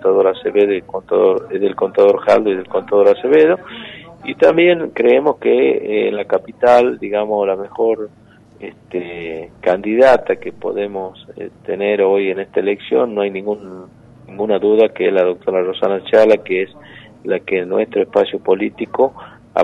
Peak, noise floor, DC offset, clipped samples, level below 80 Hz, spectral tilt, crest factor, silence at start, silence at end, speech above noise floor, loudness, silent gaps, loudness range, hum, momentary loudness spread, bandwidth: -2 dBFS; -35 dBFS; under 0.1%; under 0.1%; -56 dBFS; -6.5 dB/octave; 14 dB; 0 s; 0 s; 20 dB; -15 LUFS; none; 5 LU; none; 15 LU; 7.6 kHz